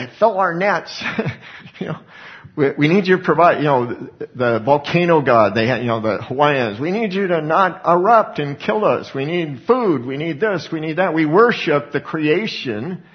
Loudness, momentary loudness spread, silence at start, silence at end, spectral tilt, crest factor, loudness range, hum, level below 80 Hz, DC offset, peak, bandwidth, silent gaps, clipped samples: -17 LUFS; 13 LU; 0 s; 0.15 s; -7 dB/octave; 18 dB; 2 LU; none; -60 dBFS; under 0.1%; 0 dBFS; 6.6 kHz; none; under 0.1%